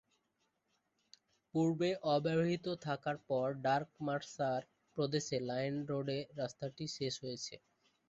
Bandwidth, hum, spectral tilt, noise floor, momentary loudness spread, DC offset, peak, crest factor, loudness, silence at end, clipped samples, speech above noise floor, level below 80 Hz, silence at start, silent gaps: 8 kHz; none; -5 dB/octave; -82 dBFS; 9 LU; under 0.1%; -20 dBFS; 18 dB; -38 LUFS; 0.55 s; under 0.1%; 45 dB; -76 dBFS; 1.55 s; none